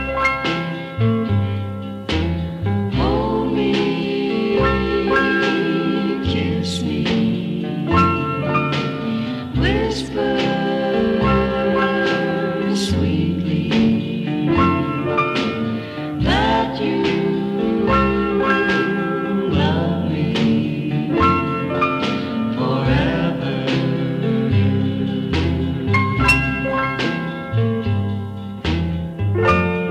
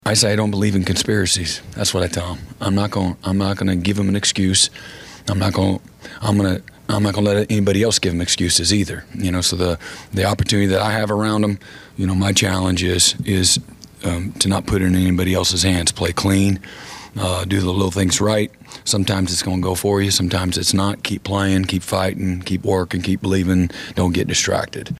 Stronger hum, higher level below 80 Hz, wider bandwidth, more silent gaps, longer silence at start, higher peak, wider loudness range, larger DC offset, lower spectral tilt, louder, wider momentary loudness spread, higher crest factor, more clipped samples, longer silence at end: neither; first, -34 dBFS vs -44 dBFS; second, 12.5 kHz vs 15.5 kHz; neither; about the same, 0 s vs 0.05 s; second, -4 dBFS vs 0 dBFS; about the same, 2 LU vs 2 LU; neither; first, -7 dB/octave vs -4 dB/octave; about the same, -19 LUFS vs -18 LUFS; second, 6 LU vs 9 LU; about the same, 14 dB vs 18 dB; neither; about the same, 0 s vs 0 s